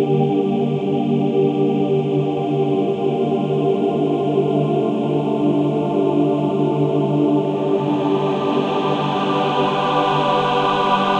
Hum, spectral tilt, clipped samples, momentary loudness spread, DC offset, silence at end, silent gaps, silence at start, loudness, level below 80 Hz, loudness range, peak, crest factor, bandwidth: none; -8 dB/octave; under 0.1%; 2 LU; under 0.1%; 0 s; none; 0 s; -18 LUFS; -58 dBFS; 1 LU; -4 dBFS; 12 dB; 8.4 kHz